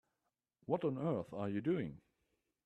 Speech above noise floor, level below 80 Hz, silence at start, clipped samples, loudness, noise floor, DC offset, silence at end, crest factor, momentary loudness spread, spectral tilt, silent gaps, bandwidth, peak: 50 dB; -74 dBFS; 0.7 s; under 0.1%; -39 LUFS; -89 dBFS; under 0.1%; 0.7 s; 20 dB; 7 LU; -9.5 dB/octave; none; 8.6 kHz; -20 dBFS